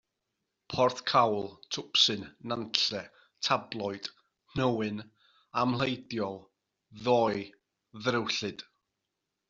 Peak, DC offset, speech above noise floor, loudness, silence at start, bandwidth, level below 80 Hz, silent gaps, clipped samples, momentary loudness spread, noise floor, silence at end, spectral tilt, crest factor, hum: -4 dBFS; under 0.1%; 55 dB; -30 LUFS; 0.7 s; 8 kHz; -66 dBFS; none; under 0.1%; 14 LU; -85 dBFS; 0.85 s; -2.5 dB/octave; 28 dB; none